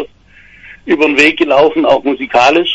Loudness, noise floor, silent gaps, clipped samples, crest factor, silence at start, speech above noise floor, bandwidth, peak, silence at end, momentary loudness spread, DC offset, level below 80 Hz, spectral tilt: -10 LUFS; -42 dBFS; none; 0.1%; 12 dB; 0 s; 32 dB; 11 kHz; 0 dBFS; 0 s; 10 LU; under 0.1%; -46 dBFS; -4 dB/octave